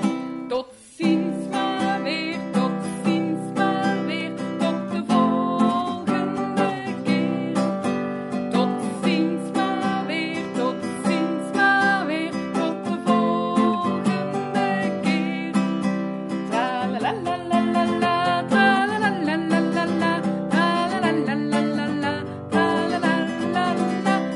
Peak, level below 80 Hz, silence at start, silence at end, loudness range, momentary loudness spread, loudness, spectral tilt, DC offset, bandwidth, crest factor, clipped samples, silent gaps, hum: -6 dBFS; -64 dBFS; 0 s; 0 s; 3 LU; 6 LU; -23 LUFS; -6 dB/octave; under 0.1%; 11.5 kHz; 16 dB; under 0.1%; none; none